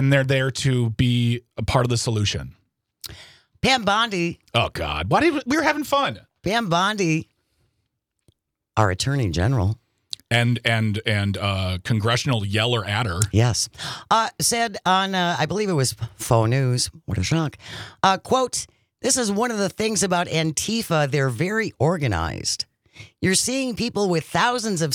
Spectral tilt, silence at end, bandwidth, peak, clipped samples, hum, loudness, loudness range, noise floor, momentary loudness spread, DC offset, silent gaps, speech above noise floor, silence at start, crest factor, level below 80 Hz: -4.5 dB/octave; 0 s; 17.5 kHz; 0 dBFS; under 0.1%; none; -22 LUFS; 3 LU; -75 dBFS; 7 LU; under 0.1%; none; 54 dB; 0 s; 22 dB; -48 dBFS